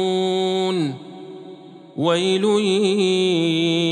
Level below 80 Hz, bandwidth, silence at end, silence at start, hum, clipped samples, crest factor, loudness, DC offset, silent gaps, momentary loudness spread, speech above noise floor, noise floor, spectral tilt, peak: -78 dBFS; 10.5 kHz; 0 s; 0 s; none; under 0.1%; 14 dB; -19 LUFS; under 0.1%; none; 19 LU; 22 dB; -40 dBFS; -5 dB/octave; -6 dBFS